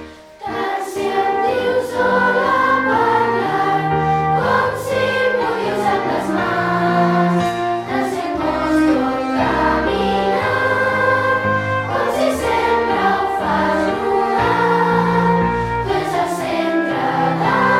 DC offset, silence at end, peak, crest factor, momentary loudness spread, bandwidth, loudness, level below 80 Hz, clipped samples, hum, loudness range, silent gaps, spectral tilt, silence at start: under 0.1%; 0 s; -2 dBFS; 14 dB; 5 LU; 16 kHz; -17 LUFS; -42 dBFS; under 0.1%; none; 1 LU; none; -6 dB/octave; 0 s